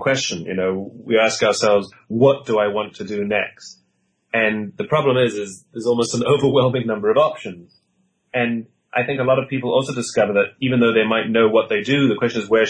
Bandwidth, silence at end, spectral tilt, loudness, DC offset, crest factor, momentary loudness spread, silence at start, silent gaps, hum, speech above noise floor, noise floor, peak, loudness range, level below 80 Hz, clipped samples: 10 kHz; 0 s; -5 dB/octave; -19 LUFS; under 0.1%; 16 dB; 10 LU; 0 s; none; none; 48 dB; -67 dBFS; -4 dBFS; 3 LU; -60 dBFS; under 0.1%